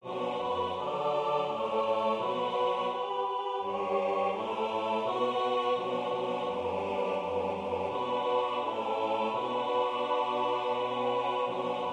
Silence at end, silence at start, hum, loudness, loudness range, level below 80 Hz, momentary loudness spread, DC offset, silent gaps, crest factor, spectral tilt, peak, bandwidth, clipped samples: 0 s; 0.05 s; none; -31 LUFS; 1 LU; -72 dBFS; 3 LU; under 0.1%; none; 14 dB; -5.5 dB/octave; -16 dBFS; 10 kHz; under 0.1%